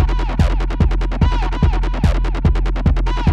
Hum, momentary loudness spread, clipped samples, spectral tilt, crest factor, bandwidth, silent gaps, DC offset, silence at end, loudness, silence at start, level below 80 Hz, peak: none; 0 LU; under 0.1%; -7.5 dB/octave; 12 dB; 7.2 kHz; none; under 0.1%; 0 s; -18 LUFS; 0 s; -16 dBFS; -2 dBFS